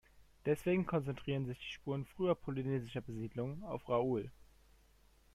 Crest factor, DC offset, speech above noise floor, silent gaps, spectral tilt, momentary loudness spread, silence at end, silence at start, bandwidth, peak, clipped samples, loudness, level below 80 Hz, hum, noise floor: 18 dB; under 0.1%; 29 dB; none; -7.5 dB/octave; 10 LU; 0.9 s; 0.15 s; 14 kHz; -22 dBFS; under 0.1%; -39 LUFS; -64 dBFS; none; -67 dBFS